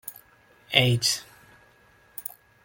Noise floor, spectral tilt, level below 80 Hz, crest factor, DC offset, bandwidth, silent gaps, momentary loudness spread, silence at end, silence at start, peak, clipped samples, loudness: -58 dBFS; -3 dB/octave; -62 dBFS; 26 dB; under 0.1%; 17 kHz; none; 20 LU; 0.45 s; 0.05 s; -2 dBFS; under 0.1%; -23 LUFS